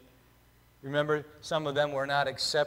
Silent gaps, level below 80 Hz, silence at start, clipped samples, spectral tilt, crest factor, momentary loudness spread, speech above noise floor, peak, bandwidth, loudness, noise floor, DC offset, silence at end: none; -66 dBFS; 0.85 s; under 0.1%; -4 dB/octave; 16 dB; 5 LU; 32 dB; -14 dBFS; 16 kHz; -30 LUFS; -62 dBFS; under 0.1%; 0 s